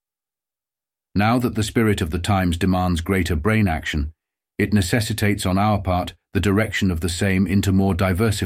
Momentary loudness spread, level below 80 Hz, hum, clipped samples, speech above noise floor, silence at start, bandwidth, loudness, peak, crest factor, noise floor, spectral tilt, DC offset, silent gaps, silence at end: 6 LU; -36 dBFS; none; under 0.1%; over 71 dB; 1.15 s; 16 kHz; -20 LUFS; -4 dBFS; 16 dB; under -90 dBFS; -6 dB/octave; under 0.1%; none; 0 s